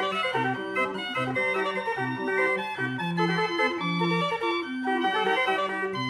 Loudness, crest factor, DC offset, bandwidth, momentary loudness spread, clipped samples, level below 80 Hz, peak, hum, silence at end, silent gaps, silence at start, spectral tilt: -26 LUFS; 14 dB; under 0.1%; 12.5 kHz; 4 LU; under 0.1%; -68 dBFS; -12 dBFS; none; 0 s; none; 0 s; -5.5 dB/octave